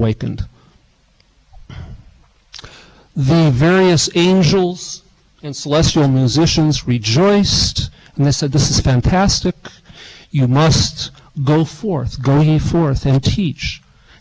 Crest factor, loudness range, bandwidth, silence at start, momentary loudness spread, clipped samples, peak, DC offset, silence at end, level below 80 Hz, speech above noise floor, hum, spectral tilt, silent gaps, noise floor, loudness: 10 dB; 3 LU; 8 kHz; 0 s; 17 LU; under 0.1%; -6 dBFS; under 0.1%; 0.45 s; -30 dBFS; 40 dB; none; -5.5 dB/octave; none; -54 dBFS; -15 LUFS